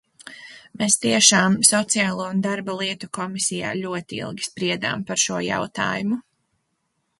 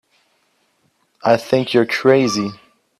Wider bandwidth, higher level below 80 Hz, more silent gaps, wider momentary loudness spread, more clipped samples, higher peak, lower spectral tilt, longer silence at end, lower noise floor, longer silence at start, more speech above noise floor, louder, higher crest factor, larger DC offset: second, 12 kHz vs 13.5 kHz; about the same, -62 dBFS vs -60 dBFS; neither; first, 15 LU vs 9 LU; neither; about the same, 0 dBFS vs 0 dBFS; second, -2.5 dB/octave vs -5 dB/octave; first, 1 s vs 0.45 s; first, -73 dBFS vs -63 dBFS; second, 0.2 s vs 1.25 s; about the same, 51 dB vs 48 dB; second, -21 LUFS vs -17 LUFS; about the same, 22 dB vs 18 dB; neither